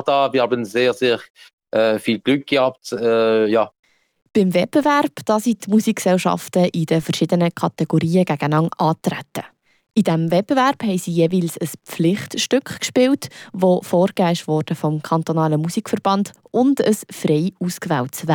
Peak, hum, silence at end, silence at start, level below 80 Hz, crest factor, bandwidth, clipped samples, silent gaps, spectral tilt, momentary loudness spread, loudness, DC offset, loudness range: -6 dBFS; none; 0 s; 0 s; -64 dBFS; 12 dB; over 20 kHz; under 0.1%; 1.30-1.34 s, 1.53-1.58 s, 3.79-3.83 s; -6 dB/octave; 6 LU; -19 LUFS; under 0.1%; 2 LU